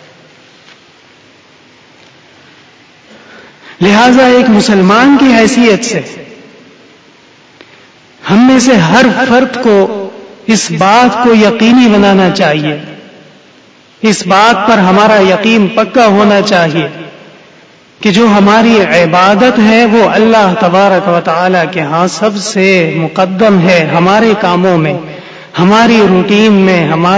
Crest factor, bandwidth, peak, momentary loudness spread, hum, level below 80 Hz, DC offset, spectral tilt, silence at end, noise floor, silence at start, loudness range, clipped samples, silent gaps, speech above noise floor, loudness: 8 dB; 8 kHz; 0 dBFS; 9 LU; none; -46 dBFS; under 0.1%; -5.5 dB/octave; 0 s; -41 dBFS; 3.65 s; 4 LU; 1%; none; 34 dB; -7 LUFS